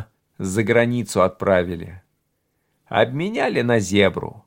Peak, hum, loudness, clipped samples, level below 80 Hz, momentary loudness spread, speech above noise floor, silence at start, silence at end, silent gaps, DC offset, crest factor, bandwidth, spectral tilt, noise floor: -2 dBFS; none; -20 LUFS; under 0.1%; -54 dBFS; 10 LU; 51 dB; 0 s; 0.1 s; none; under 0.1%; 20 dB; 16.5 kHz; -5.5 dB/octave; -71 dBFS